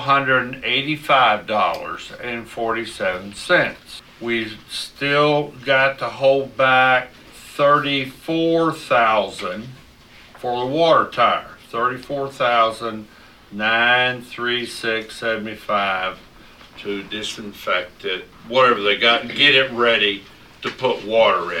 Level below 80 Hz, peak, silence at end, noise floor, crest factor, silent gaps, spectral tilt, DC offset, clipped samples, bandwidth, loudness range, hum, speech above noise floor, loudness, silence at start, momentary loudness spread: -54 dBFS; 0 dBFS; 0 s; -46 dBFS; 20 dB; none; -4 dB/octave; under 0.1%; under 0.1%; 16 kHz; 6 LU; none; 27 dB; -19 LUFS; 0 s; 14 LU